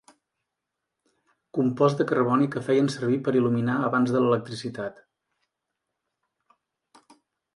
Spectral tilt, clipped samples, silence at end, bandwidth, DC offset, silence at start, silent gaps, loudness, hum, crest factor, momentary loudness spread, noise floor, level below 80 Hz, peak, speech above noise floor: -7.5 dB/octave; under 0.1%; 2.65 s; 11.5 kHz; under 0.1%; 1.55 s; none; -24 LUFS; none; 20 dB; 11 LU; -84 dBFS; -70 dBFS; -6 dBFS; 60 dB